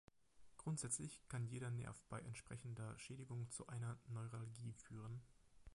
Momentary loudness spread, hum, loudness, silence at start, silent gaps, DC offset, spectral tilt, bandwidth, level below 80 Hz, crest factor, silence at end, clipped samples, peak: 8 LU; none; -51 LUFS; 0.35 s; none; under 0.1%; -5 dB/octave; 11.5 kHz; -72 dBFS; 22 dB; 0 s; under 0.1%; -28 dBFS